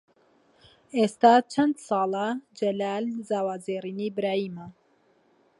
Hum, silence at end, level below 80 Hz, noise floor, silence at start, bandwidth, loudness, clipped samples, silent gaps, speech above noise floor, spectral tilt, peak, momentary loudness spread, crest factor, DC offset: none; 0.9 s; -74 dBFS; -64 dBFS; 0.95 s; 11.5 kHz; -26 LUFS; under 0.1%; none; 39 dB; -5.5 dB/octave; -6 dBFS; 13 LU; 22 dB; under 0.1%